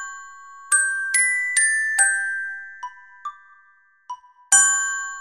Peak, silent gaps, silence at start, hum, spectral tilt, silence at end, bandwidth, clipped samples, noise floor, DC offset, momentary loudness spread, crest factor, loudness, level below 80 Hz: -2 dBFS; none; 0 s; none; 6 dB/octave; 0 s; 16.5 kHz; under 0.1%; -57 dBFS; under 0.1%; 24 LU; 22 dB; -18 LUFS; -70 dBFS